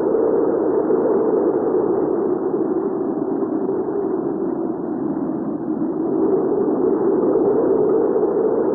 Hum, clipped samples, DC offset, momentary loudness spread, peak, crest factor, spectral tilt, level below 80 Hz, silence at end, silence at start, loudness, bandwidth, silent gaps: none; under 0.1%; under 0.1%; 6 LU; -8 dBFS; 12 dB; -13.5 dB/octave; -56 dBFS; 0 s; 0 s; -19 LUFS; 2.1 kHz; none